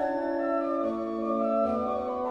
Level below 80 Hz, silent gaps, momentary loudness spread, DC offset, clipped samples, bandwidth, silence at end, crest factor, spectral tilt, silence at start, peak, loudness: -60 dBFS; none; 4 LU; under 0.1%; under 0.1%; 7.2 kHz; 0 s; 12 dB; -8 dB/octave; 0 s; -16 dBFS; -29 LUFS